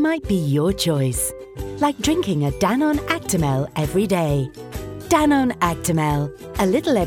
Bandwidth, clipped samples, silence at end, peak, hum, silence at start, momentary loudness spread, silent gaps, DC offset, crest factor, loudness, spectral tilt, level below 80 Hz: 17.5 kHz; under 0.1%; 0 s; -2 dBFS; none; 0 s; 8 LU; none; under 0.1%; 18 dB; -20 LUFS; -5.5 dB/octave; -38 dBFS